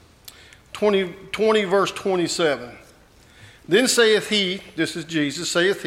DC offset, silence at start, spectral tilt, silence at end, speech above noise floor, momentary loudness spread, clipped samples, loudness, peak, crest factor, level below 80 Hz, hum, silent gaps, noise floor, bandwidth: under 0.1%; 0.25 s; -3 dB/octave; 0 s; 30 dB; 9 LU; under 0.1%; -21 LUFS; -4 dBFS; 18 dB; -58 dBFS; none; none; -51 dBFS; 16.5 kHz